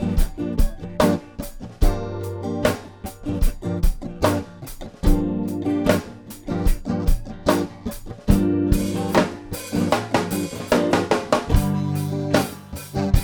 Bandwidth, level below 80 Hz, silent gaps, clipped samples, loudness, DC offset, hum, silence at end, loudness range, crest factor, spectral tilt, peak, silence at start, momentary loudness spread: over 20 kHz; -26 dBFS; none; under 0.1%; -23 LUFS; under 0.1%; none; 0 s; 4 LU; 20 dB; -6 dB/octave; -2 dBFS; 0 s; 12 LU